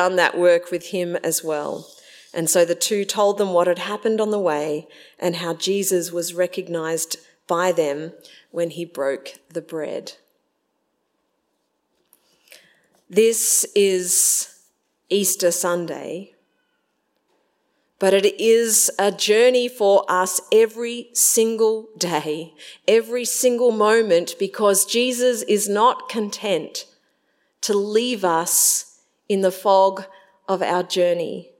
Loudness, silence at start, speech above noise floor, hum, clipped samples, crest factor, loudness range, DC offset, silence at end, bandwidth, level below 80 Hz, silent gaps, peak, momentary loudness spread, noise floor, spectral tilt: -19 LUFS; 0 s; 52 dB; none; under 0.1%; 18 dB; 8 LU; under 0.1%; 0.15 s; 16.5 kHz; -80 dBFS; none; -2 dBFS; 13 LU; -72 dBFS; -2.5 dB/octave